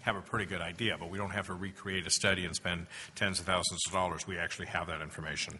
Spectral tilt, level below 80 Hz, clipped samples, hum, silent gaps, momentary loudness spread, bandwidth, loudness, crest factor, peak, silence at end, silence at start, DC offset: -2.5 dB/octave; -60 dBFS; under 0.1%; none; none; 9 LU; 11.5 kHz; -34 LUFS; 22 dB; -12 dBFS; 0 s; 0 s; under 0.1%